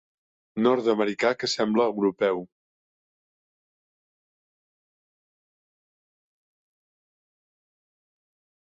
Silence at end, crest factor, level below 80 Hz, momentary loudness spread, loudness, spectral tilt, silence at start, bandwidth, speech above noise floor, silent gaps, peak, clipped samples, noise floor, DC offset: 6.25 s; 20 dB; -72 dBFS; 4 LU; -24 LUFS; -4.5 dB/octave; 0.55 s; 8 kHz; over 66 dB; none; -10 dBFS; under 0.1%; under -90 dBFS; under 0.1%